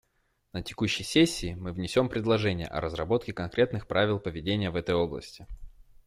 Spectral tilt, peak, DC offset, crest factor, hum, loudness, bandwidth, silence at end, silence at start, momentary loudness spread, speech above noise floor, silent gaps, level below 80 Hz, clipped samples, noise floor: -5.5 dB/octave; -10 dBFS; under 0.1%; 20 dB; none; -28 LUFS; 15.5 kHz; 0.25 s; 0.55 s; 13 LU; 44 dB; none; -50 dBFS; under 0.1%; -73 dBFS